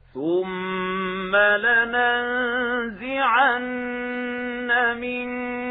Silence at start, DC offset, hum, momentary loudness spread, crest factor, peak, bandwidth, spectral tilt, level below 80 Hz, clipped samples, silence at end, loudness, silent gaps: 0.15 s; under 0.1%; none; 10 LU; 16 dB; -6 dBFS; 4.1 kHz; -7.5 dB/octave; -56 dBFS; under 0.1%; 0 s; -22 LUFS; none